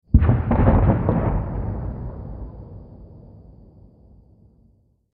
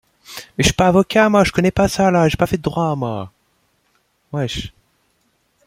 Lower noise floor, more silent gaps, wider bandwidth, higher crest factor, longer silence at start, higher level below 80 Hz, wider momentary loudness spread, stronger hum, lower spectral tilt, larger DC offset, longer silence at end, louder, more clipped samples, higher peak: second, -59 dBFS vs -64 dBFS; neither; second, 3.6 kHz vs 16 kHz; about the same, 22 dB vs 18 dB; second, 0.15 s vs 0.3 s; first, -28 dBFS vs -38 dBFS; first, 24 LU vs 17 LU; neither; first, -13.5 dB/octave vs -5.5 dB/octave; neither; first, 1.95 s vs 1 s; second, -21 LUFS vs -16 LUFS; neither; about the same, -2 dBFS vs -2 dBFS